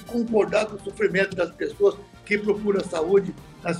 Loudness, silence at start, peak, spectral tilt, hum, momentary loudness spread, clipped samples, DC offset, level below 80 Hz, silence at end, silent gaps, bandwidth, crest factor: -24 LUFS; 0 s; -8 dBFS; -6 dB/octave; none; 8 LU; under 0.1%; under 0.1%; -54 dBFS; 0 s; none; 11.5 kHz; 16 dB